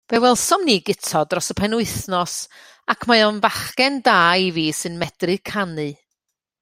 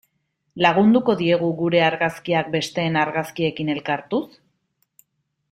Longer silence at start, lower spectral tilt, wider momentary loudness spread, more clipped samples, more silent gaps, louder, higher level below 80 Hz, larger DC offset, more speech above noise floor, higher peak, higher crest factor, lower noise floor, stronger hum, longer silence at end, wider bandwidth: second, 0.1 s vs 0.55 s; second, -3 dB/octave vs -6 dB/octave; about the same, 11 LU vs 9 LU; neither; neither; about the same, -19 LUFS vs -20 LUFS; first, -52 dBFS vs -62 dBFS; neither; first, 60 dB vs 53 dB; about the same, -2 dBFS vs -2 dBFS; about the same, 18 dB vs 20 dB; first, -79 dBFS vs -73 dBFS; neither; second, 0.65 s vs 1.25 s; about the same, 16 kHz vs 15 kHz